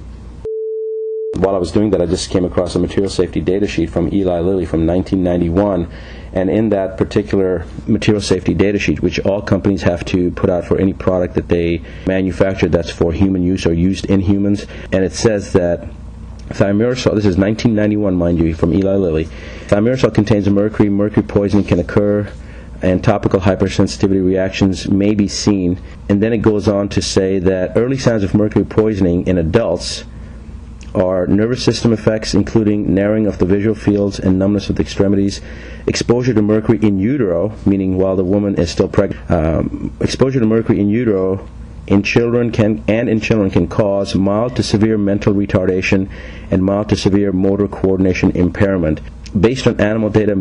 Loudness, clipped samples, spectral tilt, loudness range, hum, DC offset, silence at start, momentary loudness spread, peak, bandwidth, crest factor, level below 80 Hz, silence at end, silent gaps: -15 LUFS; under 0.1%; -6.5 dB/octave; 2 LU; none; under 0.1%; 0 s; 7 LU; -2 dBFS; 10.5 kHz; 12 dB; -32 dBFS; 0 s; none